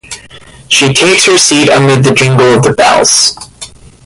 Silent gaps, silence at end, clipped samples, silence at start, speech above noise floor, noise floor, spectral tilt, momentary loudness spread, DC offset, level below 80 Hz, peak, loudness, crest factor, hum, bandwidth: none; 0.4 s; 0.2%; 0.1 s; 27 dB; -34 dBFS; -3 dB/octave; 21 LU; under 0.1%; -42 dBFS; 0 dBFS; -6 LUFS; 8 dB; none; 16 kHz